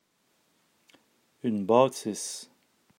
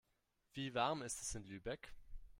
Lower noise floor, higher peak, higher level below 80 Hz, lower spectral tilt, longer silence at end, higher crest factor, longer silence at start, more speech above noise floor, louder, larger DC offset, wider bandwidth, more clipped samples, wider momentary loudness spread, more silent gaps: second, -71 dBFS vs -83 dBFS; first, -8 dBFS vs -24 dBFS; second, -84 dBFS vs -60 dBFS; first, -5 dB/octave vs -3.5 dB/octave; first, 0.55 s vs 0 s; about the same, 24 dB vs 22 dB; first, 1.45 s vs 0.55 s; first, 45 dB vs 39 dB; first, -27 LUFS vs -44 LUFS; neither; about the same, 16 kHz vs 16 kHz; neither; about the same, 13 LU vs 13 LU; neither